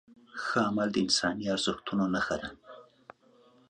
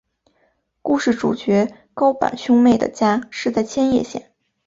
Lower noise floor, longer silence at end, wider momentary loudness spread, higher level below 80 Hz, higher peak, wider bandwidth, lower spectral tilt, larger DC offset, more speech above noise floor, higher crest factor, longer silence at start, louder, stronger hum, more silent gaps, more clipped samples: about the same, -62 dBFS vs -64 dBFS; first, 0.85 s vs 0.45 s; first, 14 LU vs 9 LU; second, -62 dBFS vs -54 dBFS; second, -12 dBFS vs -2 dBFS; first, 10 kHz vs 7.8 kHz; second, -4 dB/octave vs -5.5 dB/octave; neither; second, 32 dB vs 47 dB; about the same, 20 dB vs 16 dB; second, 0.1 s vs 0.85 s; second, -30 LUFS vs -18 LUFS; neither; neither; neither